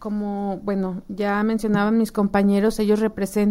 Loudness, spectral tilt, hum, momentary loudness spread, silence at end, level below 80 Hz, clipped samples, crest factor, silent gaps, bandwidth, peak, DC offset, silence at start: -22 LUFS; -7 dB/octave; none; 8 LU; 0 s; -46 dBFS; under 0.1%; 14 dB; none; 15.5 kHz; -6 dBFS; under 0.1%; 0 s